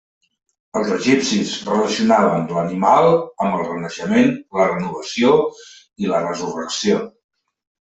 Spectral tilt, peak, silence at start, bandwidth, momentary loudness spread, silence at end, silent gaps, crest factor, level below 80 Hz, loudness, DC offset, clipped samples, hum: -5 dB/octave; -2 dBFS; 0.75 s; 8.2 kHz; 10 LU; 0.9 s; none; 16 dB; -60 dBFS; -18 LUFS; under 0.1%; under 0.1%; none